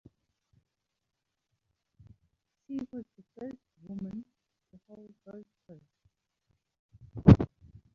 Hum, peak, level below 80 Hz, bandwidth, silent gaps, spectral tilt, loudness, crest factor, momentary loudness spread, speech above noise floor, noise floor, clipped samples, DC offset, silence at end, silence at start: none; -4 dBFS; -46 dBFS; 6.8 kHz; 6.79-6.89 s; -9.5 dB/octave; -27 LUFS; 28 dB; 29 LU; 42 dB; -85 dBFS; under 0.1%; under 0.1%; 0.5 s; 2.7 s